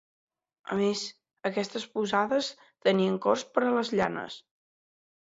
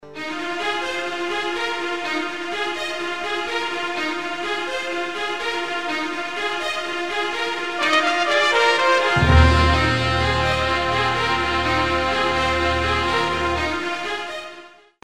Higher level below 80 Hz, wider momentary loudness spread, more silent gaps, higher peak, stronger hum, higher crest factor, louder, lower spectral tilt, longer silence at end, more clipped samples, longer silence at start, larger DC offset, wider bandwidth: second, -68 dBFS vs -32 dBFS; first, 12 LU vs 9 LU; neither; second, -8 dBFS vs -2 dBFS; neither; about the same, 22 dB vs 20 dB; second, -29 LUFS vs -21 LUFS; about the same, -5 dB/octave vs -4.5 dB/octave; first, 0.85 s vs 0 s; neither; first, 0.7 s vs 0 s; second, under 0.1% vs 0.9%; second, 8 kHz vs 13 kHz